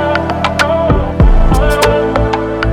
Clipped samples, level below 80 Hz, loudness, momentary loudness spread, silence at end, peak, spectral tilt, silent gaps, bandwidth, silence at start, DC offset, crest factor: under 0.1%; -14 dBFS; -12 LUFS; 4 LU; 0 s; 0 dBFS; -6 dB/octave; none; 15.5 kHz; 0 s; under 0.1%; 10 dB